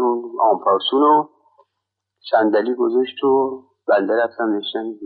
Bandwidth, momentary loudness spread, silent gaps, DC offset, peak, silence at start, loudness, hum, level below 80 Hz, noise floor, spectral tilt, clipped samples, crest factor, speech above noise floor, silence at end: 4.9 kHz; 10 LU; none; under 0.1%; -4 dBFS; 0 s; -18 LUFS; none; -78 dBFS; -79 dBFS; -2 dB/octave; under 0.1%; 16 dB; 61 dB; 0 s